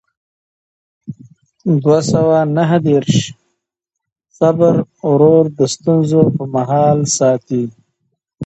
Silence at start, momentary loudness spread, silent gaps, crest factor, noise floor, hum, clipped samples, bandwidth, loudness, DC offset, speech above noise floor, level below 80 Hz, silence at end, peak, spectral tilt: 1.1 s; 10 LU; 4.12-4.16 s; 14 dB; -80 dBFS; none; under 0.1%; 8.8 kHz; -14 LUFS; under 0.1%; 68 dB; -52 dBFS; 0 s; 0 dBFS; -6.5 dB/octave